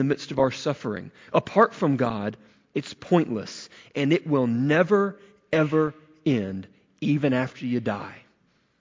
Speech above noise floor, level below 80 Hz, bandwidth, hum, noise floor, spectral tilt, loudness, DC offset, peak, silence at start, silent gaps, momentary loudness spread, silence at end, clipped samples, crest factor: 42 dB; -60 dBFS; 7.6 kHz; none; -66 dBFS; -7 dB/octave; -25 LUFS; under 0.1%; -6 dBFS; 0 s; none; 13 LU; 0.6 s; under 0.1%; 20 dB